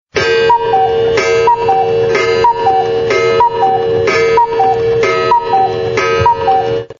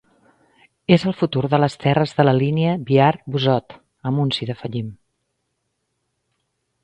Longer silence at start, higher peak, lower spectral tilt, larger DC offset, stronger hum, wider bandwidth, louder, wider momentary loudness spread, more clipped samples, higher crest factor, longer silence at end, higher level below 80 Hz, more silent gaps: second, 0.15 s vs 0.9 s; about the same, 0 dBFS vs 0 dBFS; second, -2.5 dB/octave vs -7.5 dB/octave; neither; neither; second, 7.4 kHz vs 9 kHz; first, -11 LUFS vs -19 LUFS; second, 3 LU vs 12 LU; neither; second, 10 dB vs 20 dB; second, 0.05 s vs 1.9 s; first, -42 dBFS vs -56 dBFS; neither